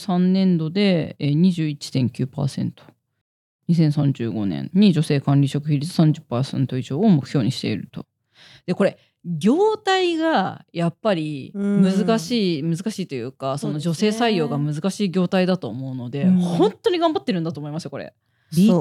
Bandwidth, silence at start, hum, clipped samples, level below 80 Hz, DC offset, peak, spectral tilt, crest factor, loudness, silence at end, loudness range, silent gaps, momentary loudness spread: 12.5 kHz; 0 s; none; under 0.1%; -66 dBFS; under 0.1%; -6 dBFS; -7 dB/octave; 14 dB; -21 LUFS; 0 s; 3 LU; 3.21-3.59 s; 11 LU